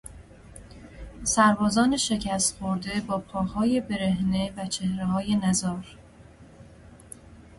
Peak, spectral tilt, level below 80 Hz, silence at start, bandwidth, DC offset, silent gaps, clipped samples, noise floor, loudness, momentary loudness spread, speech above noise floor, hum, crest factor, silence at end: -6 dBFS; -4 dB/octave; -48 dBFS; 0.05 s; 11.5 kHz; under 0.1%; none; under 0.1%; -50 dBFS; -25 LUFS; 25 LU; 25 dB; none; 20 dB; 0.1 s